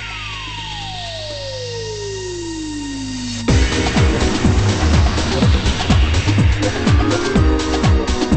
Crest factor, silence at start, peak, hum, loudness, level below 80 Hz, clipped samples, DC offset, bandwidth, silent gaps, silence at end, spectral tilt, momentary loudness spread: 14 dB; 0 s; -2 dBFS; none; -18 LUFS; -22 dBFS; under 0.1%; under 0.1%; 8.8 kHz; none; 0 s; -5.5 dB/octave; 10 LU